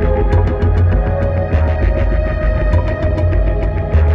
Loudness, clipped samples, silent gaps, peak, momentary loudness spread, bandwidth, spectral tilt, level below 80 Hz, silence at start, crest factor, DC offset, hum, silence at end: -16 LUFS; under 0.1%; none; -2 dBFS; 3 LU; 5 kHz; -9.5 dB/octave; -16 dBFS; 0 s; 10 dB; under 0.1%; none; 0 s